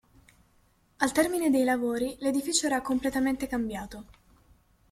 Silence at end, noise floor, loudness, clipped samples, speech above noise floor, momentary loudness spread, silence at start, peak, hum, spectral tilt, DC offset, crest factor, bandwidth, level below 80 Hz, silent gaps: 0.8 s; -65 dBFS; -28 LUFS; under 0.1%; 38 dB; 9 LU; 1 s; -8 dBFS; none; -3 dB/octave; under 0.1%; 22 dB; 16 kHz; -56 dBFS; none